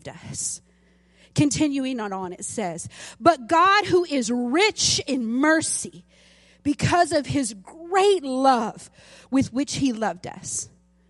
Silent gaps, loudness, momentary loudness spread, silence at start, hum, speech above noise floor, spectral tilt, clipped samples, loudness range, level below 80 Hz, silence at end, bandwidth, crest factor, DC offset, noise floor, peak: none; -22 LUFS; 12 LU; 0.05 s; none; 36 dB; -3.5 dB/octave; under 0.1%; 3 LU; -54 dBFS; 0.4 s; 11.5 kHz; 20 dB; under 0.1%; -59 dBFS; -4 dBFS